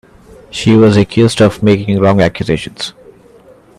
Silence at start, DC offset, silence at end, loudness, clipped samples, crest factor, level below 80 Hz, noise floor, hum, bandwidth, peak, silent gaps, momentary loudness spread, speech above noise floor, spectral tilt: 0.55 s; under 0.1%; 0.9 s; -11 LUFS; under 0.1%; 12 dB; -40 dBFS; -42 dBFS; none; 12.5 kHz; 0 dBFS; none; 15 LU; 32 dB; -6.5 dB/octave